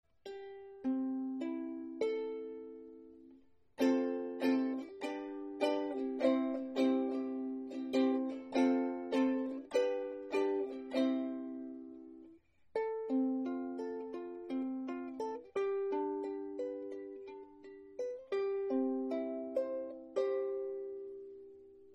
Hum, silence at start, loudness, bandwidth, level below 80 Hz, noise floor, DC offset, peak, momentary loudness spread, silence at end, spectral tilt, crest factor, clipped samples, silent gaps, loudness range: none; 0.25 s; -37 LUFS; 8.6 kHz; -80 dBFS; -64 dBFS; under 0.1%; -20 dBFS; 17 LU; 0 s; -5 dB/octave; 18 dB; under 0.1%; none; 6 LU